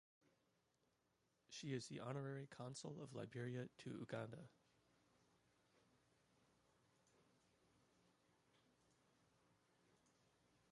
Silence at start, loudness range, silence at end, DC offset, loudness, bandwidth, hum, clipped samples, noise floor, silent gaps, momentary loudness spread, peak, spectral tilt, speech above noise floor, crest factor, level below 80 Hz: 1.5 s; 7 LU; 3.5 s; under 0.1%; -53 LUFS; 11 kHz; none; under 0.1%; -85 dBFS; none; 6 LU; -34 dBFS; -5.5 dB/octave; 34 dB; 22 dB; -90 dBFS